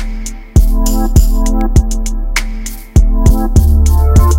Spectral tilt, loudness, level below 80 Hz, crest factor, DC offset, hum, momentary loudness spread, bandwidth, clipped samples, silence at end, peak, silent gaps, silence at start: -6 dB/octave; -13 LUFS; -10 dBFS; 10 dB; under 0.1%; none; 10 LU; 16.5 kHz; 2%; 0 s; 0 dBFS; none; 0 s